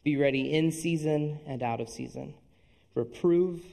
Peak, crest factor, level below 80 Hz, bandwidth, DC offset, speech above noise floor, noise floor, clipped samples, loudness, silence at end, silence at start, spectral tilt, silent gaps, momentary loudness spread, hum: -12 dBFS; 16 dB; -62 dBFS; 13 kHz; under 0.1%; 35 dB; -63 dBFS; under 0.1%; -29 LUFS; 0 s; 0.05 s; -6.5 dB/octave; none; 14 LU; none